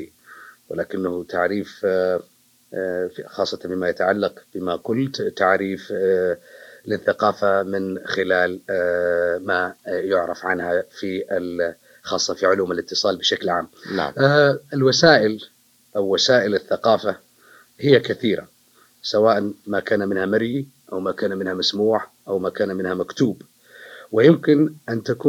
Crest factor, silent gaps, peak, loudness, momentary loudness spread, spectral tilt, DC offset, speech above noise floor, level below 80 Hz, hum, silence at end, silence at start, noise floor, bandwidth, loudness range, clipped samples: 22 dB; none; 0 dBFS; -21 LUFS; 11 LU; -5 dB/octave; under 0.1%; 36 dB; -66 dBFS; none; 0 s; 0 s; -56 dBFS; 16 kHz; 6 LU; under 0.1%